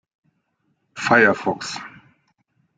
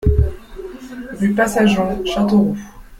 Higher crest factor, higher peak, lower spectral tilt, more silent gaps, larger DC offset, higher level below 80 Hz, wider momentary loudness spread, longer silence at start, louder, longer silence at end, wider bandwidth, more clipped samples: first, 22 dB vs 14 dB; about the same, -2 dBFS vs -2 dBFS; second, -4.5 dB/octave vs -6.5 dB/octave; neither; neither; second, -64 dBFS vs -26 dBFS; first, 24 LU vs 18 LU; first, 0.95 s vs 0 s; about the same, -19 LUFS vs -17 LUFS; first, 0.9 s vs 0.05 s; second, 9.4 kHz vs 15.5 kHz; neither